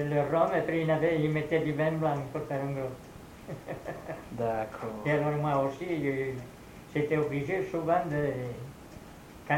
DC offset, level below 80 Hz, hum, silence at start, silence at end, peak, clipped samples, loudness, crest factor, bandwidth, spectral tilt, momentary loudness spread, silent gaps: under 0.1%; -58 dBFS; none; 0 s; 0 s; -12 dBFS; under 0.1%; -31 LUFS; 18 dB; 16.5 kHz; -7.5 dB/octave; 19 LU; none